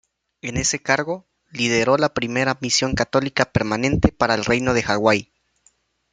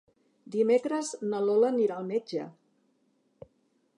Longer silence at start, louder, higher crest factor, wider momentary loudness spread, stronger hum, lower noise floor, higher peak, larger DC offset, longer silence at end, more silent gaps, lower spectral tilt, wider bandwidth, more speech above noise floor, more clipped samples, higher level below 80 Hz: about the same, 0.45 s vs 0.45 s; first, -20 LUFS vs -28 LUFS; about the same, 20 dB vs 16 dB; second, 6 LU vs 12 LU; neither; second, -62 dBFS vs -71 dBFS; first, 0 dBFS vs -14 dBFS; neither; second, 0.9 s vs 1.45 s; neither; second, -4 dB/octave vs -5.5 dB/octave; second, 9.6 kHz vs 11 kHz; about the same, 42 dB vs 44 dB; neither; first, -40 dBFS vs -80 dBFS